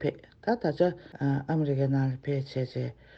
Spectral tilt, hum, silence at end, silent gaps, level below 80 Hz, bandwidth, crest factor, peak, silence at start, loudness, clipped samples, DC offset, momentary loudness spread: -9.5 dB/octave; none; 0.25 s; none; -62 dBFS; 6.2 kHz; 18 dB; -12 dBFS; 0 s; -30 LUFS; under 0.1%; under 0.1%; 7 LU